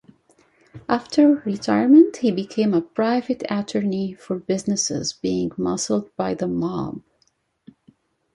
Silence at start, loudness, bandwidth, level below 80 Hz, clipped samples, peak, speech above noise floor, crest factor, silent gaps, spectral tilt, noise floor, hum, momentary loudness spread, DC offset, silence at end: 0.75 s; -21 LUFS; 11 kHz; -58 dBFS; under 0.1%; -4 dBFS; 46 dB; 18 dB; none; -5 dB/octave; -66 dBFS; none; 12 LU; under 0.1%; 1.35 s